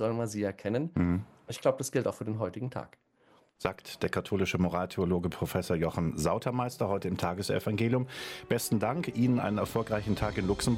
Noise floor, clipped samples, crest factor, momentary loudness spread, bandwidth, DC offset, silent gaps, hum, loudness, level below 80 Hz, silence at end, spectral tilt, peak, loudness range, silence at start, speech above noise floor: -65 dBFS; under 0.1%; 20 dB; 7 LU; 16 kHz; under 0.1%; none; none; -31 LUFS; -52 dBFS; 0 s; -6 dB/octave; -12 dBFS; 3 LU; 0 s; 34 dB